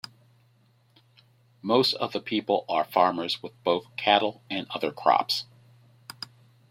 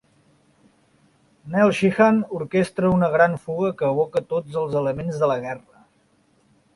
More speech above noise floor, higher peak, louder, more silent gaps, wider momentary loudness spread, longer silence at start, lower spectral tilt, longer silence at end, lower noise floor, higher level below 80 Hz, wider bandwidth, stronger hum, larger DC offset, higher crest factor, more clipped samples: second, 37 dB vs 41 dB; second, -6 dBFS vs -2 dBFS; second, -26 LUFS vs -21 LUFS; neither; first, 18 LU vs 9 LU; first, 1.65 s vs 1.45 s; second, -4.5 dB/octave vs -7.5 dB/octave; about the same, 1.25 s vs 1.15 s; about the same, -63 dBFS vs -62 dBFS; second, -74 dBFS vs -56 dBFS; first, 16.5 kHz vs 11.5 kHz; neither; neither; about the same, 22 dB vs 20 dB; neither